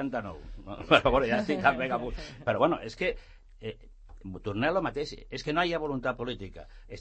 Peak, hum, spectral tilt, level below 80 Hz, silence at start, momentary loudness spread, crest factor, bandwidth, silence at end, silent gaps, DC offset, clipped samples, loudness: -6 dBFS; none; -6 dB/octave; -46 dBFS; 0 s; 20 LU; 24 dB; 8.6 kHz; 0 s; none; under 0.1%; under 0.1%; -29 LUFS